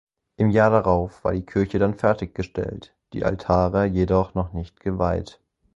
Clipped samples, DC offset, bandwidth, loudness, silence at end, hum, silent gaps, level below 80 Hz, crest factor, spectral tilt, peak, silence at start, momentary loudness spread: under 0.1%; under 0.1%; 7.8 kHz; -23 LUFS; 0.5 s; none; none; -38 dBFS; 20 dB; -8.5 dB/octave; -2 dBFS; 0.4 s; 12 LU